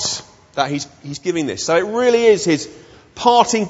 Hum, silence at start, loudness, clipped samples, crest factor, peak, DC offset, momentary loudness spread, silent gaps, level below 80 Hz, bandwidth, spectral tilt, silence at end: none; 0 s; -17 LUFS; under 0.1%; 18 dB; 0 dBFS; under 0.1%; 14 LU; none; -56 dBFS; 8 kHz; -3.5 dB/octave; 0 s